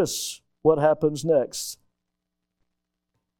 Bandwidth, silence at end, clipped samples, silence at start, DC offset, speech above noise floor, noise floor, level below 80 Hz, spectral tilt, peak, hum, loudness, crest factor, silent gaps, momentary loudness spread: 18.5 kHz; 1.65 s; under 0.1%; 0 s; under 0.1%; 59 dB; -82 dBFS; -60 dBFS; -4.5 dB/octave; -6 dBFS; none; -24 LUFS; 20 dB; none; 13 LU